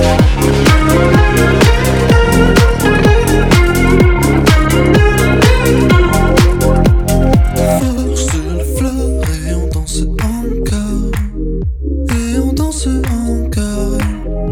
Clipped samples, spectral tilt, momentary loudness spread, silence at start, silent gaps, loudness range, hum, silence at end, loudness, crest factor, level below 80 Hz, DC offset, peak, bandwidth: under 0.1%; -6 dB/octave; 8 LU; 0 s; none; 7 LU; none; 0 s; -12 LUFS; 10 dB; -16 dBFS; under 0.1%; 0 dBFS; 18.5 kHz